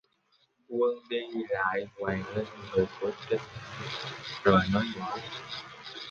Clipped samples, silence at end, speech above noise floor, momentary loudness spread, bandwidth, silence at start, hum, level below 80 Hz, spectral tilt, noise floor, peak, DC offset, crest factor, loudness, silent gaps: under 0.1%; 0 s; 39 dB; 15 LU; 7.6 kHz; 0.7 s; none; -56 dBFS; -6 dB/octave; -70 dBFS; -8 dBFS; under 0.1%; 24 dB; -31 LUFS; none